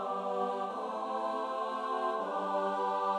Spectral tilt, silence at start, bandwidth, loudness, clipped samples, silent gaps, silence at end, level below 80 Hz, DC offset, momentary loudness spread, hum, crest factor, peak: -5 dB/octave; 0 s; 12 kHz; -34 LUFS; under 0.1%; none; 0 s; -86 dBFS; under 0.1%; 4 LU; none; 12 dB; -22 dBFS